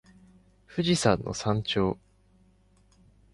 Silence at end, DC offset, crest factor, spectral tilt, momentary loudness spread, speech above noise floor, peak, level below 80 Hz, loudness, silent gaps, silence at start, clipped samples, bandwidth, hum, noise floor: 1.4 s; under 0.1%; 22 dB; -5 dB/octave; 10 LU; 36 dB; -8 dBFS; -52 dBFS; -27 LUFS; none; 0.7 s; under 0.1%; 11.5 kHz; 50 Hz at -50 dBFS; -62 dBFS